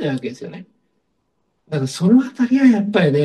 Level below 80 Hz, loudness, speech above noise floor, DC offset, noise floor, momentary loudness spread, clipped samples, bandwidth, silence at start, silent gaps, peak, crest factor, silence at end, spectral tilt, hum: -64 dBFS; -16 LUFS; 53 dB; under 0.1%; -69 dBFS; 16 LU; under 0.1%; 11.5 kHz; 0 s; none; -2 dBFS; 16 dB; 0 s; -7 dB/octave; none